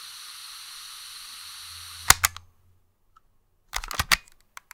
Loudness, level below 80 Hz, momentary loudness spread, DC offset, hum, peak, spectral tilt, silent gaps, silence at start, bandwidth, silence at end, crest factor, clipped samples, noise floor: -23 LUFS; -46 dBFS; 20 LU; under 0.1%; none; 0 dBFS; 0 dB/octave; none; 0 s; 18 kHz; 0.5 s; 30 dB; under 0.1%; -64 dBFS